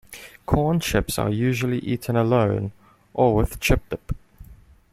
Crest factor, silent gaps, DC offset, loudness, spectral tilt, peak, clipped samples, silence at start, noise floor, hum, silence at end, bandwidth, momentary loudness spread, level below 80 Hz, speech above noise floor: 20 dB; none; under 0.1%; -22 LUFS; -6 dB/octave; -4 dBFS; under 0.1%; 0.1 s; -48 dBFS; none; 0.35 s; 16 kHz; 14 LU; -34 dBFS; 27 dB